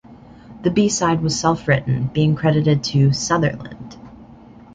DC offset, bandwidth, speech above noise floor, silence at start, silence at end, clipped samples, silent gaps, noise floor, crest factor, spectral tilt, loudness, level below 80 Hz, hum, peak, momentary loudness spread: under 0.1%; 9.2 kHz; 25 dB; 0.1 s; 0.4 s; under 0.1%; none; -43 dBFS; 16 dB; -5.5 dB/octave; -18 LUFS; -46 dBFS; none; -2 dBFS; 12 LU